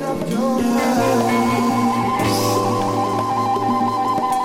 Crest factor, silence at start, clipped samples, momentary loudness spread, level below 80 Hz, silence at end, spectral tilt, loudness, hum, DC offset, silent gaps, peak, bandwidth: 12 dB; 0 s; under 0.1%; 3 LU; -50 dBFS; 0 s; -5.5 dB/octave; -18 LUFS; none; under 0.1%; none; -6 dBFS; 16.5 kHz